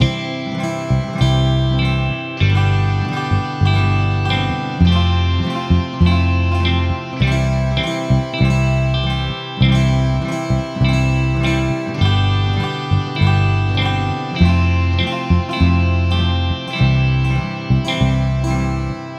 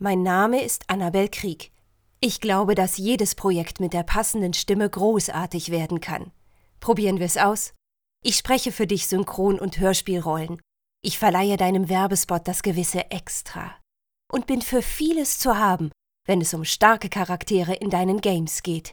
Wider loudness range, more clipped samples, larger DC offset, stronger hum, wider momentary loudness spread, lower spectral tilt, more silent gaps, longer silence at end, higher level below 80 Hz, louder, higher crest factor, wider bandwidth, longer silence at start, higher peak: about the same, 1 LU vs 3 LU; neither; neither; neither; second, 5 LU vs 10 LU; first, -6.5 dB/octave vs -4 dB/octave; neither; about the same, 0 s vs 0 s; first, -26 dBFS vs -42 dBFS; first, -17 LUFS vs -23 LUFS; second, 16 dB vs 22 dB; second, 9.8 kHz vs over 20 kHz; about the same, 0 s vs 0 s; about the same, 0 dBFS vs 0 dBFS